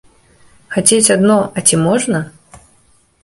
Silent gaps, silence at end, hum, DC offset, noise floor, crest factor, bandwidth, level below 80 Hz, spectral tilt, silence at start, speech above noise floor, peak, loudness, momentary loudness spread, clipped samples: none; 0.7 s; none; under 0.1%; -53 dBFS; 16 dB; 16 kHz; -50 dBFS; -4 dB/octave; 0.7 s; 40 dB; 0 dBFS; -12 LUFS; 11 LU; under 0.1%